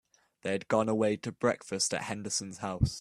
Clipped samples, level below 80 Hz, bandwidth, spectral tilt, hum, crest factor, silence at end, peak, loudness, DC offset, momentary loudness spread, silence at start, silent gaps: under 0.1%; -50 dBFS; 13.5 kHz; -4.5 dB/octave; none; 20 dB; 0 s; -12 dBFS; -32 LUFS; under 0.1%; 6 LU; 0.45 s; none